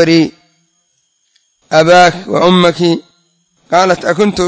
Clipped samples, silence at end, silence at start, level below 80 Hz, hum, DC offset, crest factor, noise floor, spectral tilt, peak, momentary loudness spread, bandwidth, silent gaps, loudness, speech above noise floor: 0.4%; 0 s; 0 s; -48 dBFS; none; under 0.1%; 12 dB; -60 dBFS; -5 dB/octave; 0 dBFS; 7 LU; 8 kHz; none; -10 LUFS; 51 dB